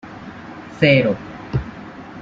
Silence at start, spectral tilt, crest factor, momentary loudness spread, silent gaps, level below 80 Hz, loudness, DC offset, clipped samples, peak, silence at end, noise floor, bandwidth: 0.05 s; -7.5 dB/octave; 20 dB; 22 LU; none; -42 dBFS; -18 LUFS; under 0.1%; under 0.1%; -2 dBFS; 0 s; -36 dBFS; 7.4 kHz